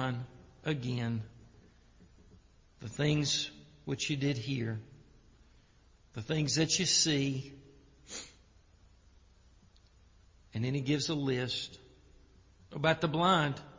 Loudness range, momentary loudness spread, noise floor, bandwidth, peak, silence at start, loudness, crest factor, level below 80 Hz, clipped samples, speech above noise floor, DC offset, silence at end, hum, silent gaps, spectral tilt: 7 LU; 18 LU; -63 dBFS; 7.8 kHz; -14 dBFS; 0 s; -32 LUFS; 22 dB; -62 dBFS; under 0.1%; 31 dB; under 0.1%; 0 s; none; none; -4 dB/octave